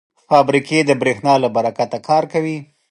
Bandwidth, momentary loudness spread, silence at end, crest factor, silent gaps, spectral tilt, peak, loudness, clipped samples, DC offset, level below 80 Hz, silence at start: 11.5 kHz; 8 LU; 0.25 s; 16 dB; none; -5.5 dB/octave; 0 dBFS; -16 LUFS; under 0.1%; under 0.1%; -64 dBFS; 0.3 s